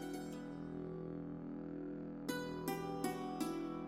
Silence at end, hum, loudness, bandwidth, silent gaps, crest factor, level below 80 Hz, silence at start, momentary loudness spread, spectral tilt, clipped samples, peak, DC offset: 0 s; none; -44 LUFS; 16 kHz; none; 18 dB; -66 dBFS; 0 s; 5 LU; -5.5 dB/octave; under 0.1%; -26 dBFS; under 0.1%